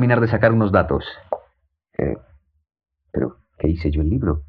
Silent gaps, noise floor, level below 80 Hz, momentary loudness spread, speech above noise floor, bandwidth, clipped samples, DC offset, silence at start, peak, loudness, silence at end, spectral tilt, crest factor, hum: none; -64 dBFS; -34 dBFS; 14 LU; 46 dB; 5.2 kHz; under 0.1%; under 0.1%; 0 s; -2 dBFS; -21 LUFS; 0.05 s; -10.5 dB/octave; 20 dB; none